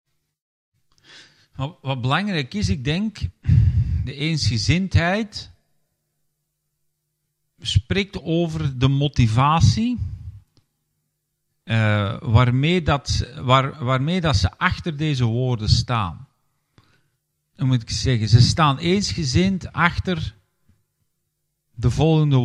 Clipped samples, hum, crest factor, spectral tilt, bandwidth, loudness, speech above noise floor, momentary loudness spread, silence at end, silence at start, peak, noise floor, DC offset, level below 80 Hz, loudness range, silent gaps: under 0.1%; none; 20 dB; -6 dB/octave; 10 kHz; -20 LUFS; 56 dB; 10 LU; 0 s; 1.15 s; 0 dBFS; -75 dBFS; under 0.1%; -38 dBFS; 6 LU; none